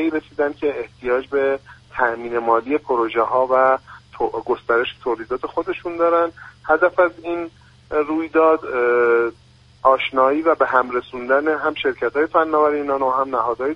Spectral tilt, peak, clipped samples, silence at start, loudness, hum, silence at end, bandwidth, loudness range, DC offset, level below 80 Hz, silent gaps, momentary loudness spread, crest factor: -6.5 dB/octave; 0 dBFS; under 0.1%; 0 s; -19 LUFS; none; 0 s; 6.4 kHz; 3 LU; under 0.1%; -54 dBFS; none; 9 LU; 18 dB